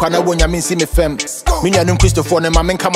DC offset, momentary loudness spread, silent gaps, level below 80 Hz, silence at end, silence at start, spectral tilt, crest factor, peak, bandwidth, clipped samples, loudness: under 0.1%; 4 LU; none; -20 dBFS; 0 s; 0 s; -4.5 dB/octave; 14 dB; 0 dBFS; 16 kHz; under 0.1%; -14 LUFS